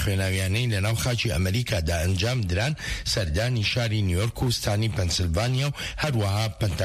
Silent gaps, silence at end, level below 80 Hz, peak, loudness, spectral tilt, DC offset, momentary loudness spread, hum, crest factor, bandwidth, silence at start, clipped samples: none; 0 s; -38 dBFS; -12 dBFS; -25 LUFS; -4.5 dB/octave; under 0.1%; 2 LU; none; 12 dB; 15.5 kHz; 0 s; under 0.1%